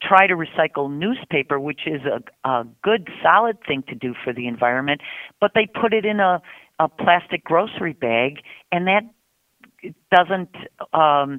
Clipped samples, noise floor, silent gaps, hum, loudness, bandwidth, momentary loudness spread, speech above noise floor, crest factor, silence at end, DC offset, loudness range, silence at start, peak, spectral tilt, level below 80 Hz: under 0.1%; -57 dBFS; none; none; -20 LUFS; 4.3 kHz; 10 LU; 37 dB; 20 dB; 0 s; under 0.1%; 2 LU; 0 s; 0 dBFS; -7 dB/octave; -64 dBFS